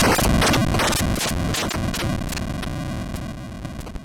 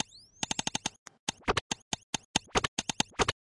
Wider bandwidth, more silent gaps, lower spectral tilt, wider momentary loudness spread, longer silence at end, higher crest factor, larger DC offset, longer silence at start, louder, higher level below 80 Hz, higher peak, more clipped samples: first, 19 kHz vs 11.5 kHz; second, none vs 0.99-1.06 s, 1.19-1.27 s, 1.61-1.70 s, 1.82-1.91 s, 2.03-2.13 s, 2.25-2.34 s, 2.68-2.77 s; first, -4 dB/octave vs -2 dB/octave; first, 16 LU vs 9 LU; about the same, 0 s vs 0.1 s; second, 12 dB vs 24 dB; neither; second, 0 s vs 0.4 s; first, -22 LUFS vs -33 LUFS; first, -30 dBFS vs -52 dBFS; about the same, -8 dBFS vs -10 dBFS; neither